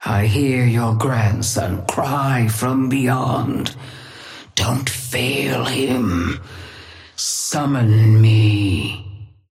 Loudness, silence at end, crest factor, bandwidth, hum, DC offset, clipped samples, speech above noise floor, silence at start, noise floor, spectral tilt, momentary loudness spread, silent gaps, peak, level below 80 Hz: -18 LUFS; 0.25 s; 14 dB; 15.5 kHz; none; under 0.1%; under 0.1%; 23 dB; 0 s; -40 dBFS; -5 dB/octave; 21 LU; none; -4 dBFS; -44 dBFS